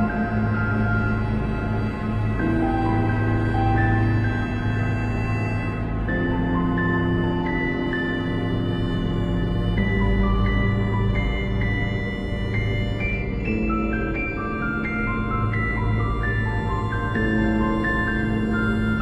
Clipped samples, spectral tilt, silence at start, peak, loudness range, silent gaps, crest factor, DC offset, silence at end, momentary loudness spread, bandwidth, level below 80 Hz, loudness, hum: under 0.1%; -8.5 dB/octave; 0 s; -8 dBFS; 2 LU; none; 14 dB; under 0.1%; 0 s; 4 LU; 7.8 kHz; -30 dBFS; -23 LUFS; none